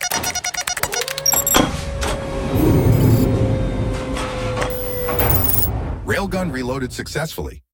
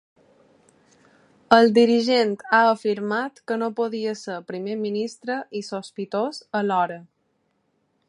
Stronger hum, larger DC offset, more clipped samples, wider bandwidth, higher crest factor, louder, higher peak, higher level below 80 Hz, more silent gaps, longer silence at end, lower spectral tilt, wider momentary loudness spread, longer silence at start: neither; neither; neither; first, 19 kHz vs 11 kHz; about the same, 18 dB vs 22 dB; first, -19 LUFS vs -22 LUFS; about the same, 0 dBFS vs 0 dBFS; first, -28 dBFS vs -72 dBFS; neither; second, 0.15 s vs 1.05 s; about the same, -4.5 dB/octave vs -5 dB/octave; second, 10 LU vs 15 LU; second, 0 s vs 1.5 s